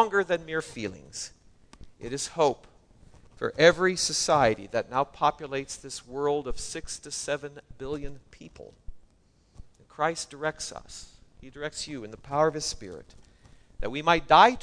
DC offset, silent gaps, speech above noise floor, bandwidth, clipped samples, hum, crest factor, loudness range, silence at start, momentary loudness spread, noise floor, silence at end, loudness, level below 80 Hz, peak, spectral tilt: under 0.1%; none; 36 dB; 11 kHz; under 0.1%; none; 24 dB; 11 LU; 0 s; 21 LU; -63 dBFS; 0 s; -27 LUFS; -50 dBFS; -4 dBFS; -3 dB/octave